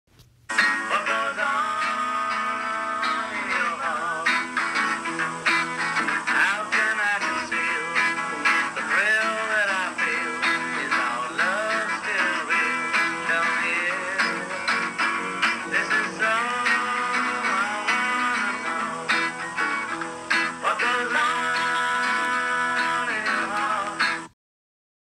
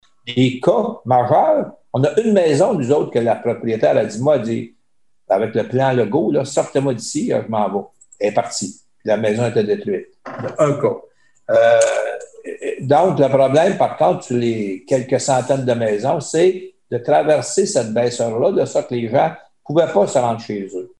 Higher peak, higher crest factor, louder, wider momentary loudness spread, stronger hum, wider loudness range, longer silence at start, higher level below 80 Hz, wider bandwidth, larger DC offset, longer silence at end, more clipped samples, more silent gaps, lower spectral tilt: second, -8 dBFS vs -2 dBFS; about the same, 16 dB vs 14 dB; second, -23 LUFS vs -17 LUFS; second, 4 LU vs 11 LU; neither; about the same, 2 LU vs 4 LU; about the same, 0.2 s vs 0.25 s; second, -68 dBFS vs -62 dBFS; first, 14.5 kHz vs 11.5 kHz; second, under 0.1% vs 0.2%; first, 0.8 s vs 0.15 s; neither; neither; second, -2 dB/octave vs -5.5 dB/octave